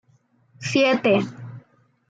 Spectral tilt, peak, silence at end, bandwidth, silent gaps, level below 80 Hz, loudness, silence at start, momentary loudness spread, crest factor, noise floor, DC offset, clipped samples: -5 dB/octave; -6 dBFS; 0.5 s; 9.2 kHz; none; -68 dBFS; -21 LUFS; 0.6 s; 21 LU; 18 dB; -61 dBFS; under 0.1%; under 0.1%